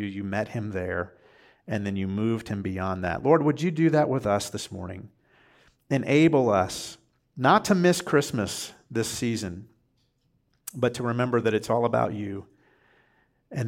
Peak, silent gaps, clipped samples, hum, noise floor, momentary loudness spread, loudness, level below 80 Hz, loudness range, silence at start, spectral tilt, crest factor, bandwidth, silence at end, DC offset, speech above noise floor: -6 dBFS; none; under 0.1%; none; -70 dBFS; 16 LU; -25 LUFS; -62 dBFS; 6 LU; 0 s; -5.5 dB/octave; 20 dB; 16.5 kHz; 0 s; under 0.1%; 45 dB